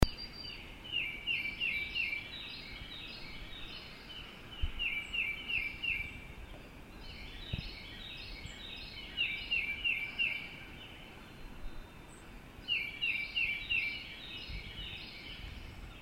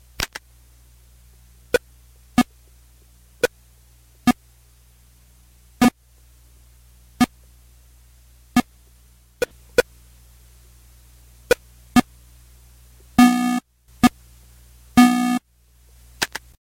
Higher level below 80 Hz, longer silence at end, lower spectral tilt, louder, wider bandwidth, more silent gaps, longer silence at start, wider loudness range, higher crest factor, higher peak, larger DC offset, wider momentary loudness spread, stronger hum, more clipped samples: about the same, -48 dBFS vs -46 dBFS; second, 0 s vs 0.35 s; about the same, -3.5 dB/octave vs -4.5 dB/octave; second, -37 LUFS vs -21 LUFS; about the same, 16 kHz vs 16.5 kHz; neither; second, 0 s vs 0.2 s; second, 4 LU vs 9 LU; first, 32 dB vs 20 dB; second, -8 dBFS vs -4 dBFS; neither; first, 18 LU vs 13 LU; neither; neither